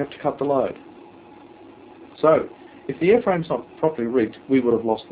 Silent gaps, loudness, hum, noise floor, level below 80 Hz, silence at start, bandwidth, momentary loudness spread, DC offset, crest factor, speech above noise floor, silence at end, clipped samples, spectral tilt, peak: none; -21 LUFS; none; -45 dBFS; -58 dBFS; 0 s; 4 kHz; 12 LU; under 0.1%; 18 dB; 24 dB; 0.1 s; under 0.1%; -11 dB/octave; -4 dBFS